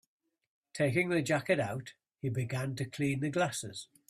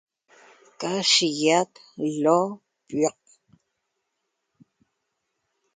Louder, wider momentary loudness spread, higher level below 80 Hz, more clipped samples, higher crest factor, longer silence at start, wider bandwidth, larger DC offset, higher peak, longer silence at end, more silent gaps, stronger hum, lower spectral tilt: second, -33 LUFS vs -23 LUFS; about the same, 12 LU vs 14 LU; first, -68 dBFS vs -74 dBFS; neither; about the same, 18 dB vs 22 dB; about the same, 0.75 s vs 0.8 s; first, 14.5 kHz vs 9.6 kHz; neither; second, -16 dBFS vs -6 dBFS; second, 0.25 s vs 2.65 s; neither; neither; first, -5.5 dB/octave vs -3 dB/octave